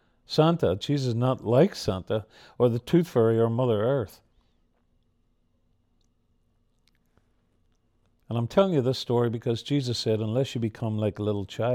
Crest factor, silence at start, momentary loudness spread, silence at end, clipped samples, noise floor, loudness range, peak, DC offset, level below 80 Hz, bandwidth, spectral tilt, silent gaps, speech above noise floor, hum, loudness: 18 dB; 0.3 s; 8 LU; 0 s; under 0.1%; -69 dBFS; 8 LU; -8 dBFS; under 0.1%; -60 dBFS; 14.5 kHz; -7 dB/octave; none; 44 dB; none; -26 LUFS